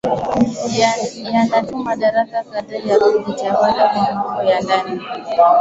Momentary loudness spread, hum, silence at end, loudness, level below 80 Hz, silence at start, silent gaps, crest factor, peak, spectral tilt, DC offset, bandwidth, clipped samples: 8 LU; none; 0 s; -17 LUFS; -52 dBFS; 0.05 s; none; 14 dB; -2 dBFS; -5 dB/octave; under 0.1%; 8 kHz; under 0.1%